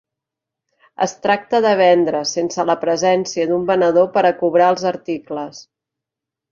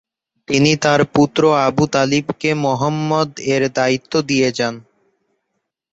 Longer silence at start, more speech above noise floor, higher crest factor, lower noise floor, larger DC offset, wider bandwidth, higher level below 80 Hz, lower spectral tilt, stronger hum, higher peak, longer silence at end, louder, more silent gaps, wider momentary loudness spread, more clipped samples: first, 1 s vs 0.5 s; first, 68 dB vs 58 dB; about the same, 16 dB vs 16 dB; first, -85 dBFS vs -74 dBFS; neither; second, 7.4 kHz vs 8.2 kHz; second, -64 dBFS vs -54 dBFS; about the same, -4.5 dB/octave vs -5 dB/octave; neither; about the same, -2 dBFS vs -2 dBFS; second, 0.9 s vs 1.1 s; about the same, -17 LUFS vs -16 LUFS; neither; first, 12 LU vs 6 LU; neither